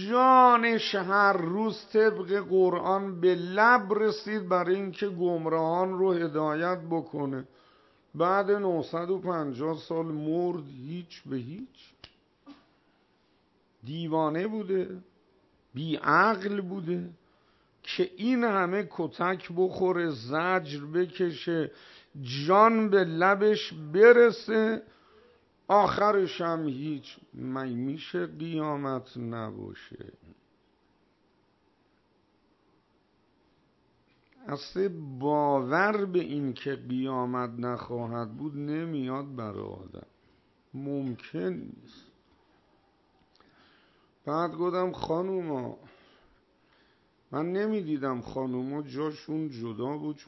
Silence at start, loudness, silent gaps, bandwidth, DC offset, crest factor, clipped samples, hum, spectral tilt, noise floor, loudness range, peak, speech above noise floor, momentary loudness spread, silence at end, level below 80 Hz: 0 s; -28 LUFS; none; 6.2 kHz; under 0.1%; 22 dB; under 0.1%; none; -7 dB/octave; -68 dBFS; 15 LU; -6 dBFS; 41 dB; 17 LU; 0.05 s; -70 dBFS